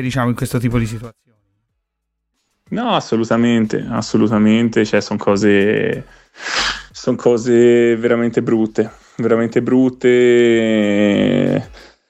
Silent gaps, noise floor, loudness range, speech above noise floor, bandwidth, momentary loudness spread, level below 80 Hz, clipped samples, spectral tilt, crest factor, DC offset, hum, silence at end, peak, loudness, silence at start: none; -74 dBFS; 6 LU; 60 dB; 13.5 kHz; 10 LU; -44 dBFS; under 0.1%; -6 dB/octave; 14 dB; under 0.1%; none; 0.3 s; -2 dBFS; -15 LUFS; 0 s